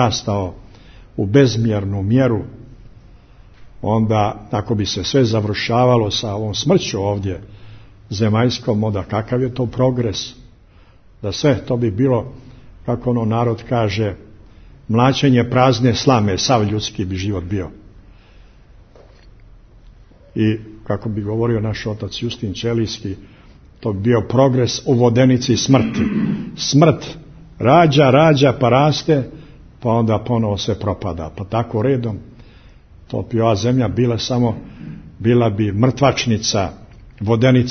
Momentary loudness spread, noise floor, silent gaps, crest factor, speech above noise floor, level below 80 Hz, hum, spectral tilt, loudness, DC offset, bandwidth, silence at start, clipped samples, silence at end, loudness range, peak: 13 LU; -47 dBFS; none; 18 dB; 30 dB; -42 dBFS; none; -6 dB/octave; -17 LUFS; under 0.1%; 6.6 kHz; 0 s; under 0.1%; 0 s; 8 LU; 0 dBFS